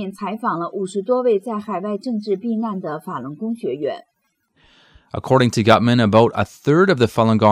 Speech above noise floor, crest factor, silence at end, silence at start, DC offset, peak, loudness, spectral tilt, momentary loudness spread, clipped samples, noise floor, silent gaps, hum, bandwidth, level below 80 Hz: 46 dB; 16 dB; 0 s; 0 s; under 0.1%; -2 dBFS; -19 LUFS; -6.5 dB/octave; 13 LU; under 0.1%; -64 dBFS; none; none; 14.5 kHz; -56 dBFS